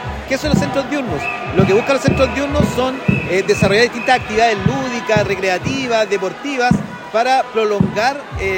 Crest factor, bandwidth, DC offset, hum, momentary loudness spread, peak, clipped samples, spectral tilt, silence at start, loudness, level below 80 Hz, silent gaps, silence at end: 16 dB; 16.5 kHz; under 0.1%; none; 6 LU; 0 dBFS; under 0.1%; -5.5 dB/octave; 0 s; -16 LUFS; -36 dBFS; none; 0 s